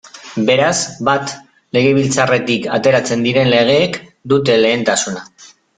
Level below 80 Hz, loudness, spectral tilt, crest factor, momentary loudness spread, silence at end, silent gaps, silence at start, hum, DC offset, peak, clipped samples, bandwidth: -54 dBFS; -14 LUFS; -4 dB/octave; 14 dB; 11 LU; 0.3 s; none; 0.05 s; none; under 0.1%; 0 dBFS; under 0.1%; 9.6 kHz